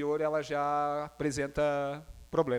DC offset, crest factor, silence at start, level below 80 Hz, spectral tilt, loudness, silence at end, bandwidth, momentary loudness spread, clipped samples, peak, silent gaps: under 0.1%; 16 dB; 0 s; -54 dBFS; -5.5 dB/octave; -32 LUFS; 0 s; 16 kHz; 4 LU; under 0.1%; -14 dBFS; none